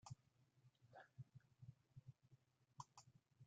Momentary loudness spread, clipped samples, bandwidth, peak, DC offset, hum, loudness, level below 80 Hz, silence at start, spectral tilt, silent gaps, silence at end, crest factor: 6 LU; under 0.1%; 8.8 kHz; -40 dBFS; under 0.1%; none; -65 LUFS; -88 dBFS; 0.05 s; -5 dB/octave; none; 0 s; 26 dB